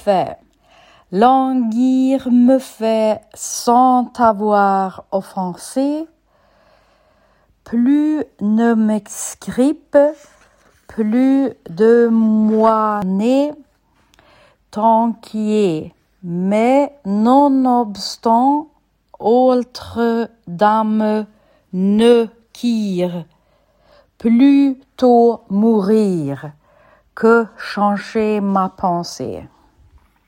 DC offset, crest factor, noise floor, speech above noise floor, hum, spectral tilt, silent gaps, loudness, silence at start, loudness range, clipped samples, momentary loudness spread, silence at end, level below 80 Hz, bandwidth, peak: under 0.1%; 16 dB; -57 dBFS; 42 dB; none; -6 dB/octave; none; -16 LUFS; 0.05 s; 4 LU; under 0.1%; 12 LU; 0.8 s; -58 dBFS; 16.5 kHz; 0 dBFS